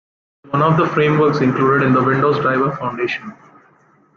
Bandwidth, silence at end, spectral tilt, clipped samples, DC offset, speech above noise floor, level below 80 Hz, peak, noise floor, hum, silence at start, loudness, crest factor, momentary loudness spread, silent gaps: 7 kHz; 0.85 s; -8 dB/octave; under 0.1%; under 0.1%; 38 dB; -56 dBFS; -2 dBFS; -53 dBFS; none; 0.5 s; -16 LUFS; 14 dB; 8 LU; none